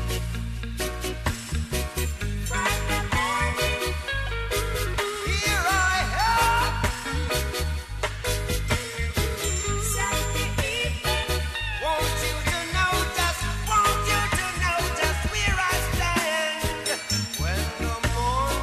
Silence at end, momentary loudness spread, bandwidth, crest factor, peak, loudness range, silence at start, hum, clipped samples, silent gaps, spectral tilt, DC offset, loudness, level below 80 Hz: 0 s; 7 LU; 13.5 kHz; 16 dB; -10 dBFS; 3 LU; 0 s; none; under 0.1%; none; -3 dB/octave; under 0.1%; -25 LUFS; -32 dBFS